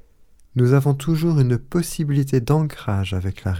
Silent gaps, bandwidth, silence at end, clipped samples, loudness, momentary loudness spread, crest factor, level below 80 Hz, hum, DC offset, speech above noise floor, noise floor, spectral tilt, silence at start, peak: none; 16 kHz; 0 s; under 0.1%; -20 LUFS; 7 LU; 16 dB; -42 dBFS; none; under 0.1%; 31 dB; -50 dBFS; -7.5 dB/octave; 0.55 s; -4 dBFS